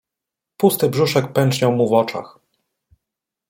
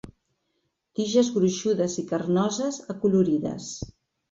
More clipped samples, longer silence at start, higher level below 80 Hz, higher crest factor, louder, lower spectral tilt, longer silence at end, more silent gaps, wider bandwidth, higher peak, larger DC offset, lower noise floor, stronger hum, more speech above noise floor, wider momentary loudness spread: neither; first, 0.6 s vs 0.05 s; about the same, -60 dBFS vs -58 dBFS; about the same, 18 dB vs 18 dB; first, -18 LUFS vs -25 LUFS; about the same, -5.5 dB/octave vs -5.5 dB/octave; first, 1.2 s vs 0.4 s; neither; first, 16.5 kHz vs 8 kHz; first, -2 dBFS vs -8 dBFS; neither; first, -85 dBFS vs -76 dBFS; neither; first, 68 dB vs 52 dB; second, 4 LU vs 14 LU